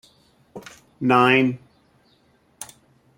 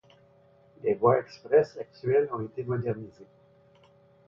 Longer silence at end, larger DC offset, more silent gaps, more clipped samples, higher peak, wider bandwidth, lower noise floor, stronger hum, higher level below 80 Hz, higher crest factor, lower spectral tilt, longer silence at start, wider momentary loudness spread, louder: second, 0.55 s vs 1.05 s; neither; neither; neither; first, -2 dBFS vs -8 dBFS; first, 16.5 kHz vs 6.8 kHz; about the same, -60 dBFS vs -60 dBFS; neither; about the same, -66 dBFS vs -66 dBFS; about the same, 22 dB vs 20 dB; second, -5.5 dB/octave vs -8.5 dB/octave; second, 0.55 s vs 0.85 s; first, 26 LU vs 11 LU; first, -18 LUFS vs -28 LUFS